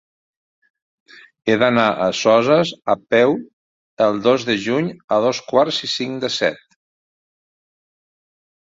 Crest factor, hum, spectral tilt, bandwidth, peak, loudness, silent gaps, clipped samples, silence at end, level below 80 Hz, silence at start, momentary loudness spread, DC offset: 18 dB; none; -4.5 dB/octave; 7.8 kHz; -2 dBFS; -18 LUFS; 3.53-3.97 s, 5.04-5.08 s; under 0.1%; 2.2 s; -62 dBFS; 1.45 s; 7 LU; under 0.1%